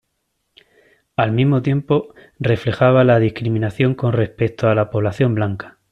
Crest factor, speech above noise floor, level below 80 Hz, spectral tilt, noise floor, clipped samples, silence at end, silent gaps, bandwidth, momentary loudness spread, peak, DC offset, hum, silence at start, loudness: 16 dB; 55 dB; -50 dBFS; -9 dB/octave; -71 dBFS; under 0.1%; 0.2 s; none; 6.6 kHz; 9 LU; -2 dBFS; under 0.1%; none; 1.2 s; -18 LUFS